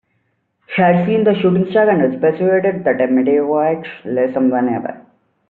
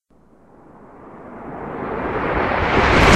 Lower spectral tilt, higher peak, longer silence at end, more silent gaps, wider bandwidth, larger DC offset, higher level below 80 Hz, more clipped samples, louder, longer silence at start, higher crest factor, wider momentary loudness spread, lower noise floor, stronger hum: first, -6.5 dB/octave vs -5 dB/octave; about the same, -2 dBFS vs 0 dBFS; first, 0.5 s vs 0 s; neither; second, 4.3 kHz vs 13.5 kHz; second, under 0.1% vs 0.1%; second, -60 dBFS vs -30 dBFS; neither; first, -15 LUFS vs -19 LUFS; second, 0.7 s vs 0.95 s; second, 12 dB vs 20 dB; second, 8 LU vs 23 LU; first, -66 dBFS vs -52 dBFS; neither